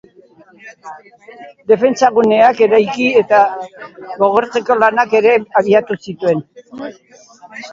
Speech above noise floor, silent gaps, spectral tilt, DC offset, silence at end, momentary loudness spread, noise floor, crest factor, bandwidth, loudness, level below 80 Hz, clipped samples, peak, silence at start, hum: 32 dB; none; -5 dB/octave; under 0.1%; 0 s; 21 LU; -45 dBFS; 14 dB; 7.6 kHz; -13 LUFS; -60 dBFS; under 0.1%; 0 dBFS; 0.65 s; none